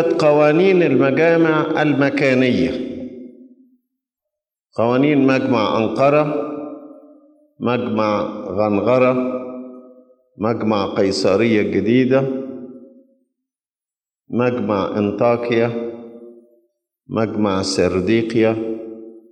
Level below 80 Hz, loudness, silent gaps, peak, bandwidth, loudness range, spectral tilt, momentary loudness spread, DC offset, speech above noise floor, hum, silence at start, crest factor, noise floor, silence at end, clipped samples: -58 dBFS; -17 LUFS; none; -4 dBFS; 10 kHz; 4 LU; -6.5 dB/octave; 17 LU; under 0.1%; over 74 dB; none; 0 s; 14 dB; under -90 dBFS; 0.15 s; under 0.1%